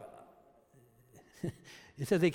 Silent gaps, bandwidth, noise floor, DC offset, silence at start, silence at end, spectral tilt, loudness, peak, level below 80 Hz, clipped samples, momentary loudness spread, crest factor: none; 16.5 kHz; -64 dBFS; under 0.1%; 0 s; 0 s; -6.5 dB/octave; -37 LUFS; -16 dBFS; -68 dBFS; under 0.1%; 27 LU; 20 dB